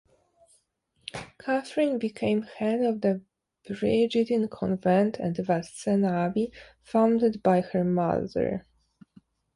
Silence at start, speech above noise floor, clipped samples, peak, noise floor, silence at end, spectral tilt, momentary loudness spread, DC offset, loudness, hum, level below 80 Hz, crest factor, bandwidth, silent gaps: 1.15 s; 45 dB; under 0.1%; -10 dBFS; -71 dBFS; 0.95 s; -7 dB/octave; 11 LU; under 0.1%; -26 LUFS; none; -60 dBFS; 18 dB; 11.5 kHz; none